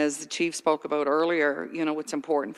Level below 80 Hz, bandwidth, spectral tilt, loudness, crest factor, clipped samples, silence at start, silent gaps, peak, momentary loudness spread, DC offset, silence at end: -76 dBFS; 13 kHz; -3.5 dB/octave; -27 LUFS; 18 dB; under 0.1%; 0 s; none; -10 dBFS; 5 LU; under 0.1%; 0 s